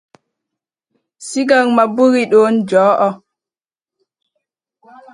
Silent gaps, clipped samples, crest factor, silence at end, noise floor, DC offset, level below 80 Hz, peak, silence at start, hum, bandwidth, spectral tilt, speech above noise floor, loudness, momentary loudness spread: none; under 0.1%; 16 dB; 2 s; under -90 dBFS; under 0.1%; -68 dBFS; 0 dBFS; 1.2 s; none; 11.5 kHz; -5 dB/octave; over 78 dB; -13 LUFS; 12 LU